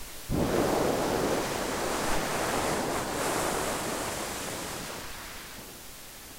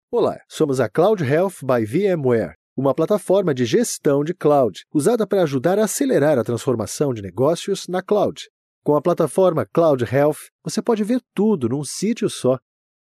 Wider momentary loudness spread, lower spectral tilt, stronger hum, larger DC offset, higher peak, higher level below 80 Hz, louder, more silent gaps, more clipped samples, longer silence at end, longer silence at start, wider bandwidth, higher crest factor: first, 14 LU vs 6 LU; second, -3.5 dB/octave vs -6 dB/octave; neither; neither; second, -12 dBFS vs -6 dBFS; first, -46 dBFS vs -62 dBFS; second, -30 LUFS vs -20 LUFS; second, none vs 2.55-2.76 s, 8.50-8.82 s, 10.52-10.59 s; neither; second, 0 s vs 0.45 s; about the same, 0 s vs 0.1 s; first, 16 kHz vs 13.5 kHz; first, 20 dB vs 14 dB